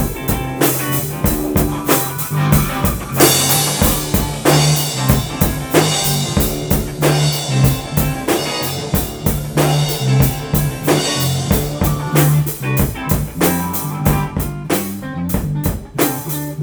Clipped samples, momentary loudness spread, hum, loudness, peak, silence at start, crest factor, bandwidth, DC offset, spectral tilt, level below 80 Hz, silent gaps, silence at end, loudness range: under 0.1%; 7 LU; none; -16 LUFS; 0 dBFS; 0 s; 16 dB; over 20 kHz; under 0.1%; -4.5 dB/octave; -28 dBFS; none; 0 s; 4 LU